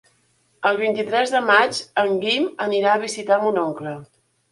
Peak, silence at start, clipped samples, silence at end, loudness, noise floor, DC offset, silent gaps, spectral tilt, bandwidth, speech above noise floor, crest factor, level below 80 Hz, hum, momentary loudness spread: -2 dBFS; 0.6 s; under 0.1%; 0.5 s; -20 LUFS; -63 dBFS; under 0.1%; none; -3.5 dB/octave; 11.5 kHz; 43 dB; 18 dB; -70 dBFS; none; 9 LU